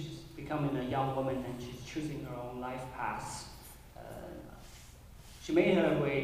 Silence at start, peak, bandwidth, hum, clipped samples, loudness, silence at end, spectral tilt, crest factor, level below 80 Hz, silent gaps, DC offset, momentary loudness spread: 0 s; -14 dBFS; 15.5 kHz; none; under 0.1%; -34 LUFS; 0 s; -6 dB/octave; 20 dB; -56 dBFS; none; under 0.1%; 23 LU